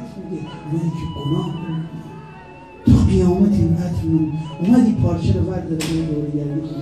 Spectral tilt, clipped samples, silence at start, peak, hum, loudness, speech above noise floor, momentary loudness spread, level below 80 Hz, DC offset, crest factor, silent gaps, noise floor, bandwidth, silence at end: -8 dB/octave; under 0.1%; 0 s; -2 dBFS; none; -19 LUFS; 20 dB; 16 LU; -32 dBFS; 0.1%; 18 dB; none; -39 dBFS; 13.5 kHz; 0 s